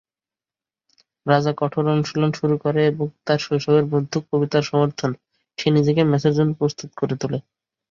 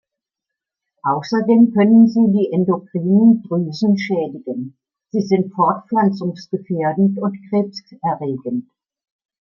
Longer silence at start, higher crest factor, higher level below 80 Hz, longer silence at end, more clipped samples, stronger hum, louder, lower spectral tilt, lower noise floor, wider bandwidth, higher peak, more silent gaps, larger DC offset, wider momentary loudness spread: first, 1.25 s vs 1.05 s; about the same, 18 dB vs 14 dB; first, -60 dBFS vs -66 dBFS; second, 0.5 s vs 0.8 s; neither; neither; second, -21 LUFS vs -17 LUFS; second, -7 dB/octave vs -8.5 dB/octave; first, under -90 dBFS vs -84 dBFS; about the same, 7.4 kHz vs 6.8 kHz; about the same, -2 dBFS vs -2 dBFS; neither; neither; second, 9 LU vs 13 LU